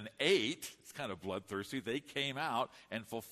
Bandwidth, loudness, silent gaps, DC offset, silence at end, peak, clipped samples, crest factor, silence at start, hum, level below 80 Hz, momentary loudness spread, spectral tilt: 13.5 kHz; -38 LUFS; none; under 0.1%; 0 s; -18 dBFS; under 0.1%; 20 dB; 0 s; none; -76 dBFS; 13 LU; -3.5 dB/octave